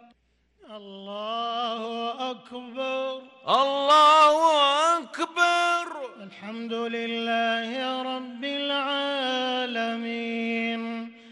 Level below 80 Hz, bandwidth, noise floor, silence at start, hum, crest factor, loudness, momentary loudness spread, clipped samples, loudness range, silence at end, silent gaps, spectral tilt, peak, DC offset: -76 dBFS; 12 kHz; -66 dBFS; 0.7 s; none; 16 dB; -24 LUFS; 18 LU; under 0.1%; 8 LU; 0 s; none; -2.5 dB/octave; -8 dBFS; under 0.1%